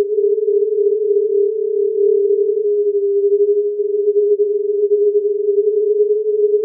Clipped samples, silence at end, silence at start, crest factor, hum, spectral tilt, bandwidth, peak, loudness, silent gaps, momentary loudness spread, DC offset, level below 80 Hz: under 0.1%; 0 s; 0 s; 8 dB; none; -2 dB/octave; 0.6 kHz; -6 dBFS; -16 LUFS; none; 3 LU; under 0.1%; under -90 dBFS